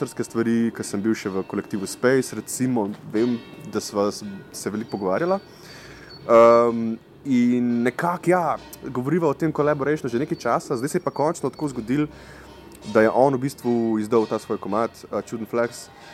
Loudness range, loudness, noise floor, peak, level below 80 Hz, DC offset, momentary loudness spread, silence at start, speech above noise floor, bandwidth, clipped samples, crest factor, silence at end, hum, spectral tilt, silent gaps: 6 LU; -23 LUFS; -42 dBFS; -4 dBFS; -58 dBFS; under 0.1%; 12 LU; 0 s; 20 dB; 15 kHz; under 0.1%; 20 dB; 0 s; none; -6 dB/octave; none